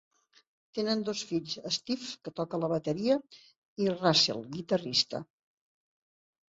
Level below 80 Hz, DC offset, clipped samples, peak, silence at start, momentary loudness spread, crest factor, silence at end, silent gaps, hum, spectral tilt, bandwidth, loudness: -72 dBFS; under 0.1%; under 0.1%; -10 dBFS; 0.75 s; 13 LU; 22 dB; 1.25 s; 3.58-3.76 s; none; -4 dB/octave; 8 kHz; -30 LUFS